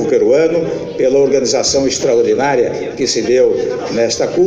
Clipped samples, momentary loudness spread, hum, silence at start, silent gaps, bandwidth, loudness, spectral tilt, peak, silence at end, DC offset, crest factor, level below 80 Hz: under 0.1%; 6 LU; none; 0 s; none; 9.2 kHz; -13 LUFS; -3.5 dB/octave; -2 dBFS; 0 s; under 0.1%; 12 dB; -46 dBFS